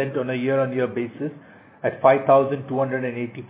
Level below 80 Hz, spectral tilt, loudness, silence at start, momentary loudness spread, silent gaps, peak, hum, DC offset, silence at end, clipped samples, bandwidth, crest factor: -68 dBFS; -11 dB/octave; -22 LUFS; 0 s; 11 LU; none; -2 dBFS; none; under 0.1%; 0.05 s; under 0.1%; 4 kHz; 20 dB